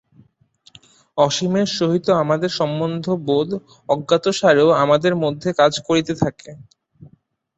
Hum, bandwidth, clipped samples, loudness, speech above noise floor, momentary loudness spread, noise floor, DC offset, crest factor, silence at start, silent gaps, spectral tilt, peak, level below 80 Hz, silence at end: none; 8.2 kHz; under 0.1%; -18 LUFS; 39 dB; 9 LU; -57 dBFS; under 0.1%; 18 dB; 1.15 s; none; -5.5 dB/octave; -2 dBFS; -56 dBFS; 0.5 s